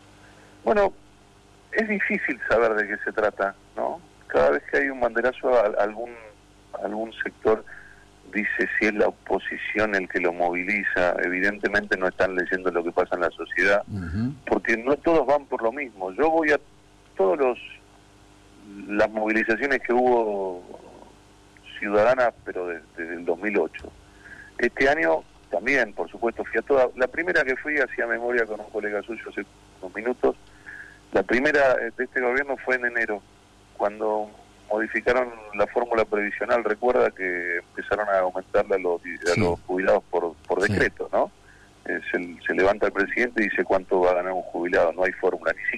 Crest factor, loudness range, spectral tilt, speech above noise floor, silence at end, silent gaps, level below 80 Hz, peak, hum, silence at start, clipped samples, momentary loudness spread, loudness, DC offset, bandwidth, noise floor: 12 dB; 3 LU; -5.5 dB/octave; 29 dB; 0 s; none; -52 dBFS; -12 dBFS; 50 Hz at -60 dBFS; 0.65 s; under 0.1%; 11 LU; -24 LUFS; under 0.1%; 11 kHz; -53 dBFS